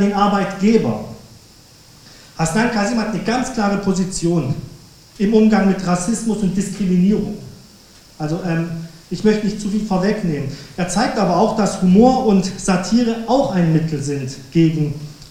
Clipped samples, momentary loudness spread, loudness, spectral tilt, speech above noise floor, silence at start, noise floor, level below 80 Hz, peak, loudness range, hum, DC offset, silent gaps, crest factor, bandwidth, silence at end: under 0.1%; 11 LU; -18 LUFS; -6 dB/octave; 29 dB; 0 s; -45 dBFS; -42 dBFS; 0 dBFS; 5 LU; none; under 0.1%; none; 18 dB; 14.5 kHz; 0 s